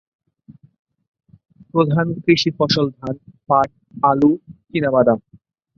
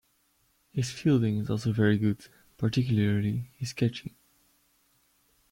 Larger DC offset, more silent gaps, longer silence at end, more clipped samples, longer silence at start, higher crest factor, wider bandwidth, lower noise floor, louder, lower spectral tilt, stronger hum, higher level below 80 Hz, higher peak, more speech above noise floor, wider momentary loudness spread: neither; neither; second, 0.6 s vs 1.45 s; neither; first, 1.75 s vs 0.75 s; about the same, 18 dB vs 16 dB; second, 7.2 kHz vs 16 kHz; second, -48 dBFS vs -70 dBFS; first, -18 LUFS vs -28 LUFS; about the same, -6.5 dB/octave vs -7 dB/octave; neither; about the same, -56 dBFS vs -60 dBFS; first, -2 dBFS vs -12 dBFS; second, 30 dB vs 43 dB; about the same, 11 LU vs 12 LU